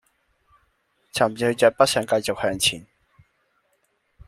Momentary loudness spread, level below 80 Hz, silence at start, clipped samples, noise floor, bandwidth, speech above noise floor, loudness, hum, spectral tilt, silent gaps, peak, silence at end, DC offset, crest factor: 8 LU; -58 dBFS; 1.15 s; under 0.1%; -69 dBFS; 15.5 kHz; 48 dB; -21 LUFS; none; -3 dB/octave; none; -2 dBFS; 1.45 s; under 0.1%; 22 dB